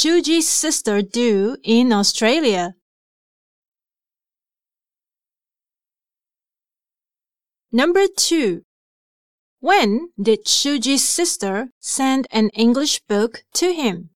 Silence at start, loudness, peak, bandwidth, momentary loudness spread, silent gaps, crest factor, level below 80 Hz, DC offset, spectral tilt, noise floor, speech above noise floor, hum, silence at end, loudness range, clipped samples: 0 s; -17 LUFS; -2 dBFS; 16.5 kHz; 7 LU; 2.82-3.62 s, 3.68-3.72 s, 8.64-9.57 s, 11.72-11.81 s; 18 dB; -64 dBFS; under 0.1%; -2.5 dB/octave; under -90 dBFS; over 72 dB; none; 0.1 s; 6 LU; under 0.1%